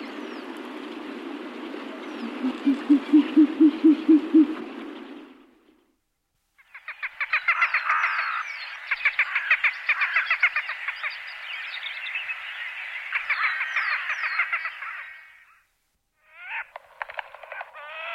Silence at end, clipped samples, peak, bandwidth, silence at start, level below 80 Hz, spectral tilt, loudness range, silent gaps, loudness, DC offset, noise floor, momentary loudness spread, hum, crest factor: 0 s; under 0.1%; -8 dBFS; 6.6 kHz; 0 s; -74 dBFS; -4 dB/octave; 9 LU; none; -24 LUFS; under 0.1%; -75 dBFS; 19 LU; none; 18 dB